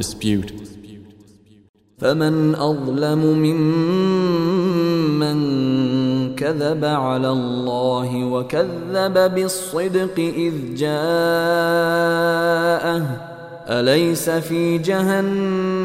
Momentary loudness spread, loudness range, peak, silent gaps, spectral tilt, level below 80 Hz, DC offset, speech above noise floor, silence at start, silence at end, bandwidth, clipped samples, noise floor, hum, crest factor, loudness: 5 LU; 2 LU; -2 dBFS; 1.69-1.74 s; -6 dB/octave; -54 dBFS; under 0.1%; 31 dB; 0 s; 0 s; 16 kHz; under 0.1%; -49 dBFS; none; 16 dB; -19 LUFS